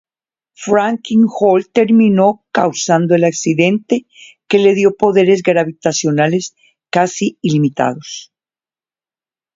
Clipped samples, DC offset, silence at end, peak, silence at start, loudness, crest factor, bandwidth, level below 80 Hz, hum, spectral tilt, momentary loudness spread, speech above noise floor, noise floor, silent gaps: under 0.1%; under 0.1%; 1.3 s; 0 dBFS; 0.6 s; -14 LUFS; 14 dB; 7.8 kHz; -58 dBFS; none; -5.5 dB/octave; 9 LU; over 77 dB; under -90 dBFS; none